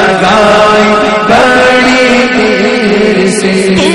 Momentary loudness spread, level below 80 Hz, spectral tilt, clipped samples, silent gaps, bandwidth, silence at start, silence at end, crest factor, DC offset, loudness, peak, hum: 3 LU; -36 dBFS; -4.5 dB/octave; 2%; none; 11.5 kHz; 0 s; 0 s; 6 dB; 0.7%; -6 LUFS; 0 dBFS; none